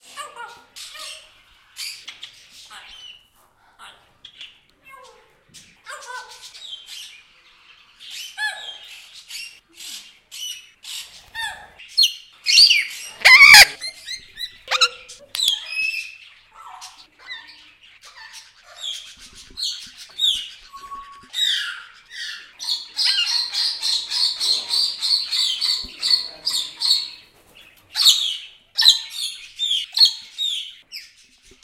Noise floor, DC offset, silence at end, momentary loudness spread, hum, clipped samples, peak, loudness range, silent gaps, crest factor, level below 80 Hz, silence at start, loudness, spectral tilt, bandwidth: -57 dBFS; under 0.1%; 0.6 s; 24 LU; none; under 0.1%; 0 dBFS; 25 LU; none; 22 dB; -56 dBFS; 0.15 s; -16 LUFS; 3 dB/octave; 16 kHz